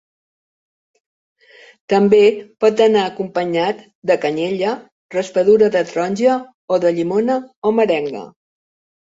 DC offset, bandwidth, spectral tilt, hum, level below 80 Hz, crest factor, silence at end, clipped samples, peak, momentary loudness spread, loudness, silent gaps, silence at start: under 0.1%; 7.8 kHz; -6 dB/octave; none; -62 dBFS; 16 dB; 0.75 s; under 0.1%; -2 dBFS; 10 LU; -17 LUFS; 3.95-4.02 s, 4.92-5.09 s, 6.54-6.68 s, 7.56-7.62 s; 1.9 s